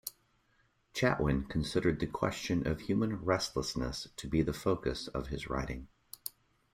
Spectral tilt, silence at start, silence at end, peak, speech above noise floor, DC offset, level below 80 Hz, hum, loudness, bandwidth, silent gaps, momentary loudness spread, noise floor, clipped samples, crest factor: -5.5 dB/octave; 0.05 s; 0.45 s; -14 dBFS; 39 dB; under 0.1%; -48 dBFS; none; -34 LUFS; 16 kHz; none; 13 LU; -72 dBFS; under 0.1%; 22 dB